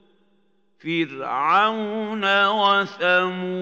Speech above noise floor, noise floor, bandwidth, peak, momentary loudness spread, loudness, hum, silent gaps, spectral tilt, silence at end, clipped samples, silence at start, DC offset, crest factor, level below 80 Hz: 45 dB; -66 dBFS; 15 kHz; -6 dBFS; 9 LU; -20 LUFS; none; none; -5 dB/octave; 0 s; under 0.1%; 0.85 s; under 0.1%; 16 dB; -84 dBFS